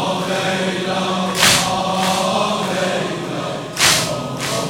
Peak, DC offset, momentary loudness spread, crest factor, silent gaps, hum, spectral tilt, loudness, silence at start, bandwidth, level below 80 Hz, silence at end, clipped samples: 0 dBFS; under 0.1%; 10 LU; 18 dB; none; none; -2.5 dB/octave; -17 LUFS; 0 s; 17 kHz; -50 dBFS; 0 s; under 0.1%